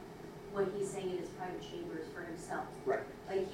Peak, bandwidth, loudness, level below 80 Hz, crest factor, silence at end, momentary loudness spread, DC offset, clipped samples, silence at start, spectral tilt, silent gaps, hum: -22 dBFS; 16 kHz; -41 LUFS; -64 dBFS; 18 dB; 0 s; 8 LU; under 0.1%; under 0.1%; 0 s; -5.5 dB/octave; none; none